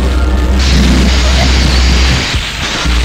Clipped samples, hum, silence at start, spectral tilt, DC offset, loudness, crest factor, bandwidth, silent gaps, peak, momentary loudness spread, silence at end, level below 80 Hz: 0.1%; none; 0 s; -4.5 dB/octave; under 0.1%; -10 LUFS; 8 dB; 12 kHz; none; 0 dBFS; 5 LU; 0 s; -10 dBFS